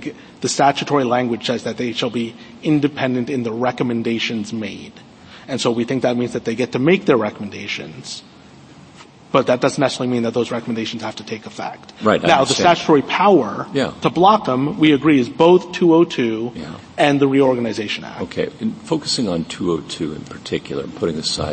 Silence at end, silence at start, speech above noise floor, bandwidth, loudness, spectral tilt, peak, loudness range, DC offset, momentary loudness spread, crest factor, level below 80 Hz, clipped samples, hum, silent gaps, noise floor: 0 s; 0 s; 25 dB; 8.8 kHz; -18 LUFS; -5 dB/octave; 0 dBFS; 7 LU; under 0.1%; 14 LU; 18 dB; -54 dBFS; under 0.1%; none; none; -43 dBFS